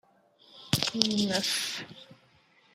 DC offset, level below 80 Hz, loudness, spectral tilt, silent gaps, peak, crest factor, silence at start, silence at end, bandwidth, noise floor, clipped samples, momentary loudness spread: under 0.1%; -66 dBFS; -28 LUFS; -3 dB/octave; none; 0 dBFS; 32 dB; 0.55 s; 0.6 s; 16 kHz; -63 dBFS; under 0.1%; 22 LU